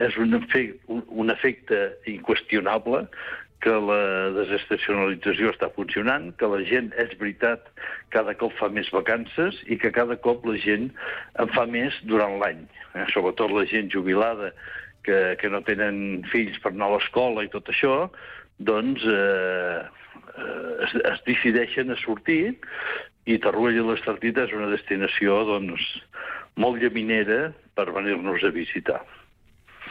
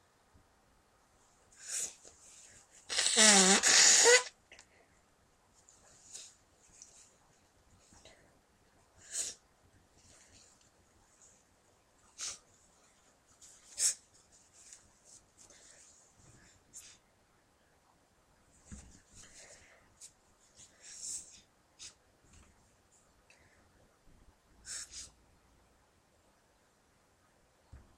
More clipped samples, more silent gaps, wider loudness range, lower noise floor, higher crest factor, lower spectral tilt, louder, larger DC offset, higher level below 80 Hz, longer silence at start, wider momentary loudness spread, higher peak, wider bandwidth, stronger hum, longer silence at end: neither; neither; second, 1 LU vs 26 LU; second, -56 dBFS vs -70 dBFS; second, 14 dB vs 28 dB; first, -7.5 dB/octave vs -0.5 dB/octave; first, -24 LUFS vs -27 LUFS; neither; first, -58 dBFS vs -70 dBFS; second, 0 s vs 1.65 s; second, 10 LU vs 33 LU; about the same, -10 dBFS vs -10 dBFS; second, 5.4 kHz vs 16 kHz; neither; second, 0 s vs 2.95 s